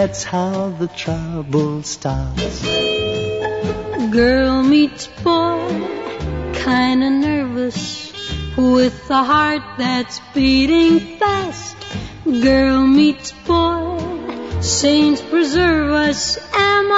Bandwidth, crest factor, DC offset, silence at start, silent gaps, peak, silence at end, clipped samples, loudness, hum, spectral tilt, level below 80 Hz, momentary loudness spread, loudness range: 8 kHz; 14 dB; 0.2%; 0 s; none; -2 dBFS; 0 s; under 0.1%; -17 LUFS; none; -4.5 dB/octave; -34 dBFS; 12 LU; 4 LU